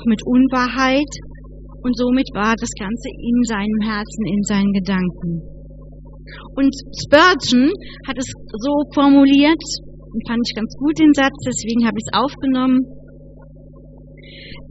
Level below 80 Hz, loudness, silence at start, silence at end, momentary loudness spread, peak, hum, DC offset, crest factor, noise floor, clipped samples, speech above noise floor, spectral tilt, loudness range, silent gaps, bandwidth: -38 dBFS; -17 LUFS; 0 s; 0.1 s; 16 LU; 0 dBFS; 50 Hz at -35 dBFS; under 0.1%; 18 dB; -40 dBFS; under 0.1%; 23 dB; -4 dB/octave; 6 LU; none; 8 kHz